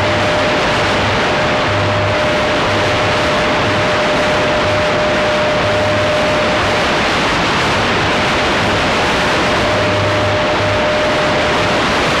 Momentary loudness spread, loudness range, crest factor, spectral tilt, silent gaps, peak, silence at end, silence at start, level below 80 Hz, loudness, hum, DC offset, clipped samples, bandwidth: 1 LU; 0 LU; 8 dB; -4.5 dB/octave; none; -4 dBFS; 0 s; 0 s; -32 dBFS; -13 LUFS; none; under 0.1%; under 0.1%; 14.5 kHz